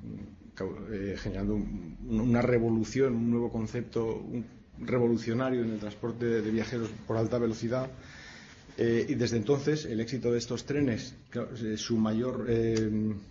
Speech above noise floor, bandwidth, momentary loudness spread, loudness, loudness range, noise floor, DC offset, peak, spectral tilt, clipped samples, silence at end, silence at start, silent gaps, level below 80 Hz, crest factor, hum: 20 dB; 7.6 kHz; 12 LU; -31 LUFS; 2 LU; -50 dBFS; under 0.1%; -14 dBFS; -6.5 dB/octave; under 0.1%; 0 s; 0 s; none; -50 dBFS; 18 dB; none